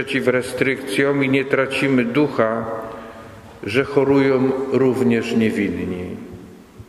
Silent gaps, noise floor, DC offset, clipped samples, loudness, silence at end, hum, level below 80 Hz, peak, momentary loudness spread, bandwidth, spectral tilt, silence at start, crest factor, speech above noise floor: none; -40 dBFS; under 0.1%; under 0.1%; -19 LUFS; 0.05 s; none; -52 dBFS; -2 dBFS; 16 LU; 14 kHz; -6.5 dB/octave; 0 s; 18 dB; 22 dB